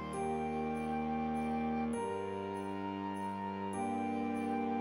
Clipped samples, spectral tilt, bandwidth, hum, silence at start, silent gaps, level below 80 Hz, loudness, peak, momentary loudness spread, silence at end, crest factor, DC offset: under 0.1%; -6.5 dB/octave; 11 kHz; none; 0 s; none; -60 dBFS; -38 LUFS; -24 dBFS; 4 LU; 0 s; 12 dB; under 0.1%